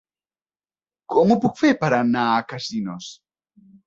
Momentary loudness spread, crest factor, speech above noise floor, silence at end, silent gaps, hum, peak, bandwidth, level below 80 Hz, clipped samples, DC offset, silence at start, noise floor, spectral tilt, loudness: 13 LU; 18 dB; over 70 dB; 0.75 s; none; none; -4 dBFS; 7.6 kHz; -62 dBFS; under 0.1%; under 0.1%; 1.1 s; under -90 dBFS; -6 dB/octave; -20 LUFS